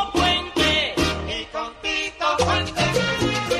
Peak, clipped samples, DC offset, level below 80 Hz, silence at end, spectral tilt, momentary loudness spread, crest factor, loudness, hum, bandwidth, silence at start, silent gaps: -6 dBFS; under 0.1%; under 0.1%; -38 dBFS; 0 s; -3.5 dB/octave; 8 LU; 16 dB; -21 LUFS; none; 13 kHz; 0 s; none